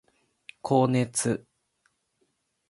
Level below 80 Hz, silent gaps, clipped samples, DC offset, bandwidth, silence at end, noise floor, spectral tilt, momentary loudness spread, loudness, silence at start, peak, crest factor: -66 dBFS; none; under 0.1%; under 0.1%; 11.5 kHz; 1.3 s; -74 dBFS; -5.5 dB/octave; 11 LU; -26 LUFS; 0.65 s; -8 dBFS; 22 dB